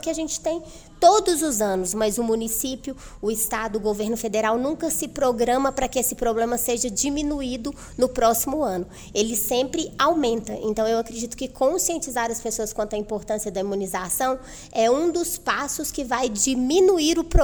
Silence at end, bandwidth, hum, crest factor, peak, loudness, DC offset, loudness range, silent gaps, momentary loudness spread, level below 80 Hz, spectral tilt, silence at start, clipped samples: 0 s; over 20 kHz; none; 20 dB; -2 dBFS; -23 LUFS; under 0.1%; 3 LU; none; 8 LU; -38 dBFS; -3 dB/octave; 0 s; under 0.1%